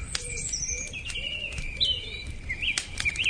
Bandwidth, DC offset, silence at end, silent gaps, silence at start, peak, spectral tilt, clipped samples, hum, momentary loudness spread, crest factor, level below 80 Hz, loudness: 10 kHz; under 0.1%; 0 s; none; 0 s; -8 dBFS; -0.5 dB/octave; under 0.1%; none; 9 LU; 24 dB; -40 dBFS; -29 LUFS